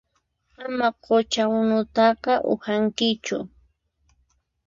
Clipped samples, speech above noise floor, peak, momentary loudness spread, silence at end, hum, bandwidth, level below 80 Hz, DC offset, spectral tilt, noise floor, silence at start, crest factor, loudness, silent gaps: under 0.1%; 48 dB; -6 dBFS; 11 LU; 1.2 s; none; 7.6 kHz; -60 dBFS; under 0.1%; -4.5 dB/octave; -70 dBFS; 0.6 s; 18 dB; -22 LUFS; none